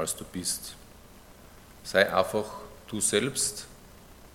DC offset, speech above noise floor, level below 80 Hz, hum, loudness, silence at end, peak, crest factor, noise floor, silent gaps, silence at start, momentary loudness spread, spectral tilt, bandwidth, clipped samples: under 0.1%; 23 dB; -56 dBFS; none; -28 LUFS; 0 s; -4 dBFS; 26 dB; -51 dBFS; none; 0 s; 19 LU; -2.5 dB/octave; 17.5 kHz; under 0.1%